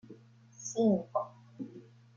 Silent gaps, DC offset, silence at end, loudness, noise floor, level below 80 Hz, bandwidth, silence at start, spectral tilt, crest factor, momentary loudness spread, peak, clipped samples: none; under 0.1%; 0.35 s; -32 LUFS; -56 dBFS; -80 dBFS; 7.4 kHz; 0.1 s; -6.5 dB/octave; 18 dB; 18 LU; -18 dBFS; under 0.1%